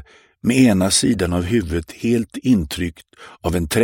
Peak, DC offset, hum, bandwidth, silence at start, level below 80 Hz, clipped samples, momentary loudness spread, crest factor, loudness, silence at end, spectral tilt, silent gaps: -2 dBFS; under 0.1%; none; 17 kHz; 0.45 s; -38 dBFS; under 0.1%; 11 LU; 18 dB; -19 LUFS; 0 s; -5 dB/octave; none